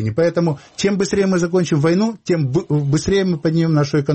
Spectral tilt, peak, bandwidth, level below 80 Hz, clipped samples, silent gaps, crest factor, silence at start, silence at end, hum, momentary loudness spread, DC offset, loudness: -6.5 dB/octave; -6 dBFS; 8.6 kHz; -46 dBFS; under 0.1%; none; 12 dB; 0 s; 0 s; none; 4 LU; under 0.1%; -18 LUFS